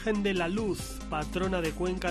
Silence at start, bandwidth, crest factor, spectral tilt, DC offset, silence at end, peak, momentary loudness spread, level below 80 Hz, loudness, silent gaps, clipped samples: 0 s; 14 kHz; 14 dB; -5.5 dB/octave; under 0.1%; 0 s; -16 dBFS; 6 LU; -42 dBFS; -31 LUFS; none; under 0.1%